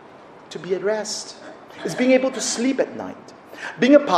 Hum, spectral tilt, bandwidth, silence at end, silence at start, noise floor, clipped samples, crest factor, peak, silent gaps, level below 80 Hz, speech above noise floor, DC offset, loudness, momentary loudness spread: none; -3.5 dB/octave; 13.5 kHz; 0 s; 0.15 s; -44 dBFS; under 0.1%; 20 dB; -2 dBFS; none; -68 dBFS; 24 dB; under 0.1%; -21 LUFS; 21 LU